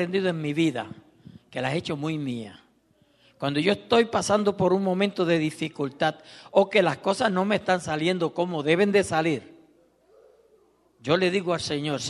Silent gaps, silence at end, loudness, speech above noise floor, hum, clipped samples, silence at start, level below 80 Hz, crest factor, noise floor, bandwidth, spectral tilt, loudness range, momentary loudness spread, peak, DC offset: none; 0 s; -25 LUFS; 39 dB; none; under 0.1%; 0 s; -64 dBFS; 20 dB; -63 dBFS; 12 kHz; -5.5 dB/octave; 6 LU; 10 LU; -6 dBFS; under 0.1%